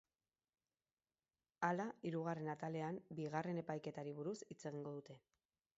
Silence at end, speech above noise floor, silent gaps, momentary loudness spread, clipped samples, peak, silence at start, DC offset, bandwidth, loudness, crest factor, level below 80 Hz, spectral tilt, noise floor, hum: 0.6 s; over 44 dB; none; 9 LU; under 0.1%; -24 dBFS; 1.6 s; under 0.1%; 7.6 kHz; -46 LUFS; 24 dB; -88 dBFS; -6.5 dB/octave; under -90 dBFS; none